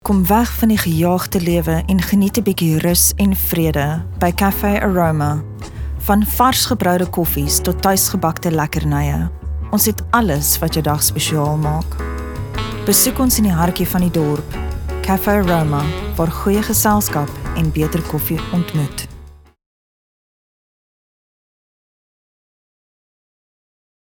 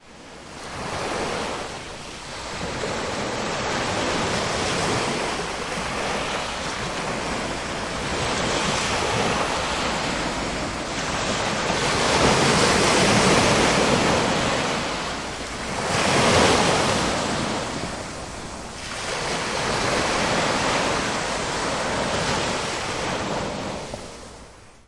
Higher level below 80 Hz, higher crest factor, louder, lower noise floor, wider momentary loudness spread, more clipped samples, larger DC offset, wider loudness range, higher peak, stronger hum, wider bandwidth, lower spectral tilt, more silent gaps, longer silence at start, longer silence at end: first, -30 dBFS vs -42 dBFS; about the same, 18 dB vs 20 dB; first, -16 LUFS vs -22 LUFS; second, -38 dBFS vs -45 dBFS; second, 10 LU vs 14 LU; neither; neither; second, 5 LU vs 8 LU; first, 0 dBFS vs -4 dBFS; neither; first, over 20 kHz vs 11.5 kHz; about the same, -4.5 dB/octave vs -3.5 dB/octave; neither; about the same, 0.05 s vs 0.05 s; first, 4.75 s vs 0.05 s